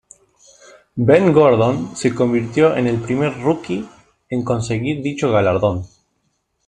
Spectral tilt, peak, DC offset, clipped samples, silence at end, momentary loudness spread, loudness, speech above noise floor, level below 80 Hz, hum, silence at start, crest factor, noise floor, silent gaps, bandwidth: -7 dB/octave; 0 dBFS; under 0.1%; under 0.1%; 0.8 s; 14 LU; -17 LUFS; 52 dB; -50 dBFS; none; 0.95 s; 18 dB; -68 dBFS; none; 10.5 kHz